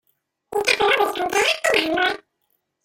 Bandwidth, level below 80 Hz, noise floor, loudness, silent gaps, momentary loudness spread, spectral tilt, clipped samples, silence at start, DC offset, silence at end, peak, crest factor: 16.5 kHz; -58 dBFS; -72 dBFS; -19 LUFS; none; 7 LU; -1.5 dB/octave; under 0.1%; 0.5 s; under 0.1%; 0.7 s; -2 dBFS; 20 dB